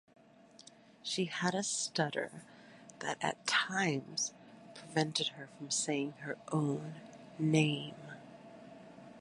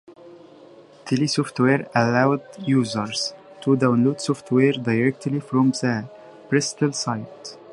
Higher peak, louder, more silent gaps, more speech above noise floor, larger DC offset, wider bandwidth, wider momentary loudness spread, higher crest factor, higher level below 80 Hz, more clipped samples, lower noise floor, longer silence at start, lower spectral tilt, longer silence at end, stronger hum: second, -16 dBFS vs -4 dBFS; second, -35 LUFS vs -22 LUFS; neither; about the same, 25 dB vs 26 dB; neither; about the same, 11.5 kHz vs 11.5 kHz; first, 22 LU vs 10 LU; about the same, 22 dB vs 18 dB; second, -80 dBFS vs -64 dBFS; neither; first, -60 dBFS vs -47 dBFS; first, 1.05 s vs 0.1 s; second, -3.5 dB/octave vs -5.5 dB/octave; about the same, 0 s vs 0 s; neither